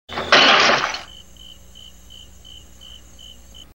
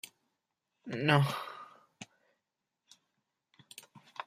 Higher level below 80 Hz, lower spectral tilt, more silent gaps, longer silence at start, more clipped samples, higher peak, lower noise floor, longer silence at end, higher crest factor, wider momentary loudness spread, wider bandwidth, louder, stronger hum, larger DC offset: first, -50 dBFS vs -76 dBFS; second, -1.5 dB/octave vs -6 dB/octave; neither; about the same, 0.1 s vs 0.05 s; neither; first, 0 dBFS vs -10 dBFS; second, -44 dBFS vs -87 dBFS; first, 2.7 s vs 0.05 s; second, 22 dB vs 28 dB; second, 15 LU vs 25 LU; about the same, 16 kHz vs 15 kHz; first, -14 LUFS vs -31 LUFS; first, 60 Hz at -50 dBFS vs none; first, 0.4% vs under 0.1%